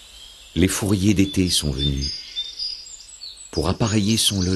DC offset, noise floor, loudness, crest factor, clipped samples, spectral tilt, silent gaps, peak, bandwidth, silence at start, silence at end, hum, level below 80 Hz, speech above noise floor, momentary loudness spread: under 0.1%; -43 dBFS; -21 LUFS; 20 dB; under 0.1%; -4 dB/octave; none; -2 dBFS; 13 kHz; 0 s; 0 s; none; -36 dBFS; 23 dB; 17 LU